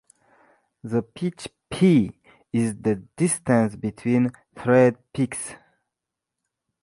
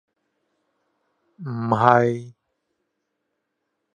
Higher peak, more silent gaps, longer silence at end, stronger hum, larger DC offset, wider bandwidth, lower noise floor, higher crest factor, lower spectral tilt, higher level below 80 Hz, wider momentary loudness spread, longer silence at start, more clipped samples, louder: second, -4 dBFS vs 0 dBFS; neither; second, 1.25 s vs 1.65 s; neither; neither; first, 11.5 kHz vs 9.6 kHz; first, -85 dBFS vs -77 dBFS; second, 20 dB vs 26 dB; second, -6.5 dB/octave vs -8 dB/octave; first, -58 dBFS vs -66 dBFS; second, 13 LU vs 16 LU; second, 0.85 s vs 1.4 s; neither; second, -23 LUFS vs -19 LUFS